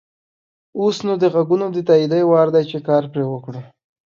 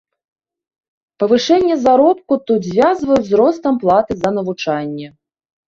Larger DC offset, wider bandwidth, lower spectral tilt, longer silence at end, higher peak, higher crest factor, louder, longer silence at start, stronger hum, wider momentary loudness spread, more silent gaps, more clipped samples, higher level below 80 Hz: neither; about the same, 7.4 kHz vs 7.6 kHz; first, -7.5 dB/octave vs -6 dB/octave; about the same, 0.5 s vs 0.6 s; about the same, -2 dBFS vs -2 dBFS; about the same, 16 dB vs 14 dB; about the same, -17 LUFS vs -15 LUFS; second, 0.75 s vs 1.2 s; neither; first, 15 LU vs 8 LU; neither; neither; second, -66 dBFS vs -52 dBFS